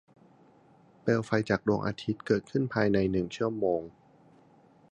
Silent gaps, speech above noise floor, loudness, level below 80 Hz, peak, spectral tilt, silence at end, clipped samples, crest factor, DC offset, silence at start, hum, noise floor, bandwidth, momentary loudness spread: none; 31 dB; -29 LUFS; -58 dBFS; -10 dBFS; -7 dB/octave; 1.05 s; under 0.1%; 22 dB; under 0.1%; 1.05 s; none; -60 dBFS; 9.8 kHz; 7 LU